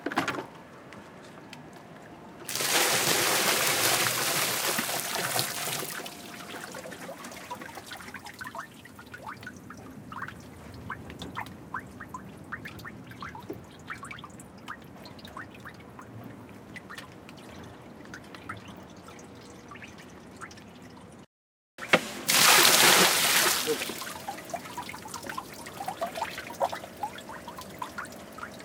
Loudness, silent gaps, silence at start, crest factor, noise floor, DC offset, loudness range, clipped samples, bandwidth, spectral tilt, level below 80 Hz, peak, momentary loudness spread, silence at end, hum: -25 LUFS; 21.26-21.78 s; 0 s; 28 dB; under -90 dBFS; under 0.1%; 23 LU; under 0.1%; 18 kHz; -1 dB/octave; -66 dBFS; -2 dBFS; 24 LU; 0 s; none